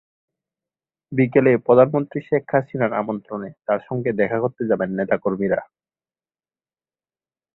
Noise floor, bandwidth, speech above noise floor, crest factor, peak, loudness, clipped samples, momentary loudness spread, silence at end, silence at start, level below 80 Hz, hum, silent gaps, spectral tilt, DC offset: under -90 dBFS; 4.1 kHz; over 70 dB; 20 dB; -2 dBFS; -20 LUFS; under 0.1%; 11 LU; 1.9 s; 1.1 s; -62 dBFS; none; none; -11.5 dB/octave; under 0.1%